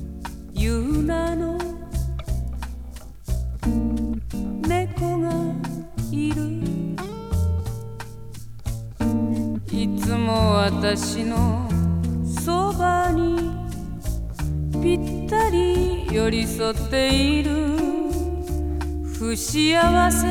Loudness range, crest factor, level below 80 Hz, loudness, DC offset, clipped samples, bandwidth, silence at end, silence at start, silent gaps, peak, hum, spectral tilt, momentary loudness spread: 6 LU; 18 dB; -30 dBFS; -23 LUFS; under 0.1%; under 0.1%; 19 kHz; 0 s; 0 s; none; -4 dBFS; none; -5.5 dB/octave; 13 LU